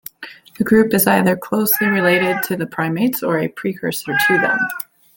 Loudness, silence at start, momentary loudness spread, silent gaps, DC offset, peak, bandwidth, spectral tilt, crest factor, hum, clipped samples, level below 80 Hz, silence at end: -17 LUFS; 0.2 s; 10 LU; none; under 0.1%; 0 dBFS; 17 kHz; -5 dB/octave; 16 dB; none; under 0.1%; -56 dBFS; 0.35 s